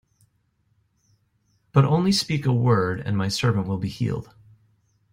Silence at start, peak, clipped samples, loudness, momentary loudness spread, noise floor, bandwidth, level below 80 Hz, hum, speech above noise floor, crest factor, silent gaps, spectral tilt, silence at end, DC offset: 1.75 s; -4 dBFS; under 0.1%; -23 LUFS; 9 LU; -68 dBFS; 16 kHz; -56 dBFS; none; 46 dB; 20 dB; none; -6 dB/octave; 0.9 s; under 0.1%